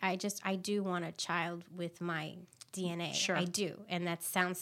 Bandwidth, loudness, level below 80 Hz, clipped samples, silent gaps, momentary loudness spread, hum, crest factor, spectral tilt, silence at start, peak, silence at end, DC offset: 16.5 kHz; -36 LUFS; -84 dBFS; under 0.1%; none; 10 LU; none; 24 dB; -3.5 dB/octave; 0 s; -14 dBFS; 0 s; under 0.1%